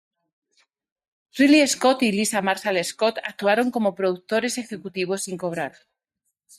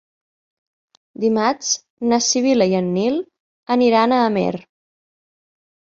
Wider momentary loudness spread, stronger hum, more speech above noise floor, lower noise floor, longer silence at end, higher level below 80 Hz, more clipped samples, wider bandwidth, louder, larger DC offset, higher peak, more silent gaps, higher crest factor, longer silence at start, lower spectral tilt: first, 13 LU vs 9 LU; neither; second, 57 dB vs over 73 dB; second, -78 dBFS vs under -90 dBFS; second, 0.9 s vs 1.25 s; second, -68 dBFS vs -62 dBFS; neither; first, 14.5 kHz vs 7.8 kHz; second, -22 LUFS vs -18 LUFS; neither; second, -6 dBFS vs -2 dBFS; second, none vs 1.90-1.97 s, 3.40-3.63 s; about the same, 18 dB vs 18 dB; first, 1.35 s vs 1.2 s; about the same, -3.5 dB/octave vs -4 dB/octave